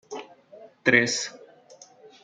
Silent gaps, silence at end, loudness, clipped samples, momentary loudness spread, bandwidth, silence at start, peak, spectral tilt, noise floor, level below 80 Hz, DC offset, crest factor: none; 0.9 s; -23 LUFS; under 0.1%; 21 LU; 9.6 kHz; 0.1 s; -6 dBFS; -3 dB/octave; -52 dBFS; -74 dBFS; under 0.1%; 24 dB